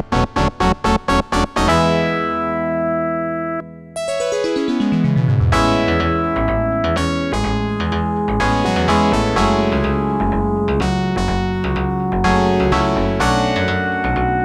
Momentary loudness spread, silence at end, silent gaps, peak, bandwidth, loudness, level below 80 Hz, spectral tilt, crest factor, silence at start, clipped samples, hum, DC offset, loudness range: 5 LU; 0 s; none; 0 dBFS; 13.5 kHz; -17 LUFS; -28 dBFS; -6 dB/octave; 16 dB; 0 s; under 0.1%; none; under 0.1%; 2 LU